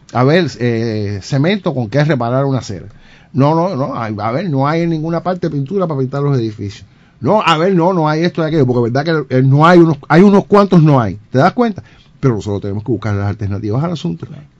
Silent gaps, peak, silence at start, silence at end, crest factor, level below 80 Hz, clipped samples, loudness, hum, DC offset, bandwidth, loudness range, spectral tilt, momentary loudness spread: none; 0 dBFS; 0.15 s; 0.15 s; 14 dB; -46 dBFS; 0.5%; -14 LUFS; none; under 0.1%; 7.8 kHz; 6 LU; -8 dB/octave; 11 LU